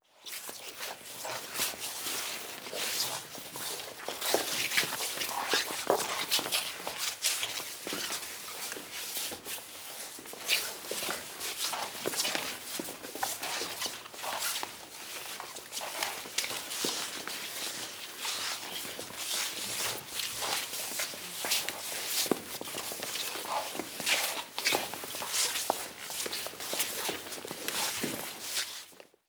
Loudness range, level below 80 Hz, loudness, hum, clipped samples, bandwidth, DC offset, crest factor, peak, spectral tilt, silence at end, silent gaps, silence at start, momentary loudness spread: 4 LU; -74 dBFS; -33 LUFS; none; under 0.1%; over 20 kHz; under 0.1%; 26 dB; -10 dBFS; 0 dB/octave; 0.25 s; none; 0.15 s; 10 LU